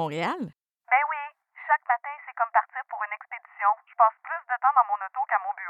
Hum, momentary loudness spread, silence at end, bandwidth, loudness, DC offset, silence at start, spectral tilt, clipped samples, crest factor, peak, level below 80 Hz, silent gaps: none; 14 LU; 0 s; 8.6 kHz; -26 LUFS; under 0.1%; 0 s; -5.5 dB/octave; under 0.1%; 20 dB; -6 dBFS; -86 dBFS; none